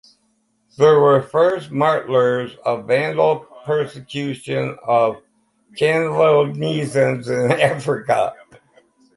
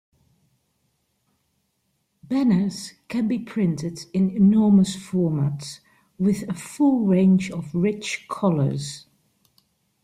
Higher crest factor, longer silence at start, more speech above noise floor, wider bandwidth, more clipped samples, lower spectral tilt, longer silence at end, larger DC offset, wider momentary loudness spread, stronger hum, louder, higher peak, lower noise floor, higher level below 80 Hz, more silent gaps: about the same, 18 dB vs 16 dB; second, 0.8 s vs 2.3 s; second, 47 dB vs 51 dB; about the same, 11.5 kHz vs 12.5 kHz; neither; about the same, -6 dB/octave vs -7 dB/octave; second, 0.85 s vs 1.05 s; neither; second, 10 LU vs 13 LU; neither; first, -18 LUFS vs -22 LUFS; first, -2 dBFS vs -8 dBFS; second, -65 dBFS vs -72 dBFS; about the same, -62 dBFS vs -60 dBFS; neither